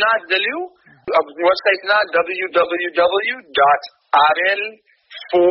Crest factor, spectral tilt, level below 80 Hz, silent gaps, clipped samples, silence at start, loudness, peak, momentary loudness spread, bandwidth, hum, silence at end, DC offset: 16 dB; 1 dB/octave; -62 dBFS; none; under 0.1%; 0 s; -17 LUFS; -2 dBFS; 8 LU; 5.8 kHz; none; 0 s; under 0.1%